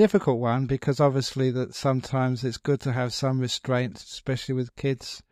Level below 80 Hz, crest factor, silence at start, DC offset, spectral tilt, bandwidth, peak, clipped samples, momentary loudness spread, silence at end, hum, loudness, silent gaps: -54 dBFS; 18 dB; 0 s; under 0.1%; -6 dB/octave; 13 kHz; -6 dBFS; under 0.1%; 7 LU; 0.1 s; none; -26 LUFS; none